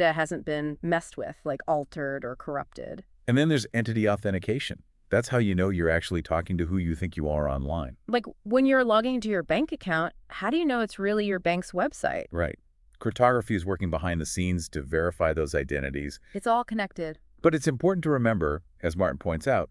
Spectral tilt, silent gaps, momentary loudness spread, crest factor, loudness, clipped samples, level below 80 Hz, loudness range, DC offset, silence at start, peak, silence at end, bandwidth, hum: -6 dB/octave; none; 10 LU; 20 dB; -27 LUFS; under 0.1%; -46 dBFS; 3 LU; under 0.1%; 0 s; -6 dBFS; 0.05 s; 12 kHz; none